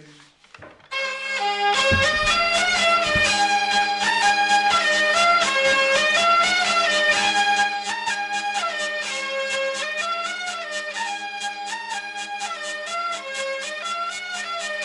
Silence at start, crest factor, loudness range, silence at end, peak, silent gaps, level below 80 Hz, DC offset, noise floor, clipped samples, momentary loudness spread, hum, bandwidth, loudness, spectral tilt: 0 s; 14 dB; 10 LU; 0 s; -8 dBFS; none; -50 dBFS; under 0.1%; -50 dBFS; under 0.1%; 11 LU; none; 12 kHz; -20 LUFS; -1 dB/octave